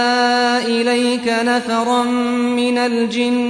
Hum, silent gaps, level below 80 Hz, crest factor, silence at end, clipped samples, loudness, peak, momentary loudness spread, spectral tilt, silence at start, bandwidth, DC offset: none; none; -60 dBFS; 10 dB; 0 s; under 0.1%; -16 LUFS; -6 dBFS; 3 LU; -3.5 dB/octave; 0 s; 10.5 kHz; under 0.1%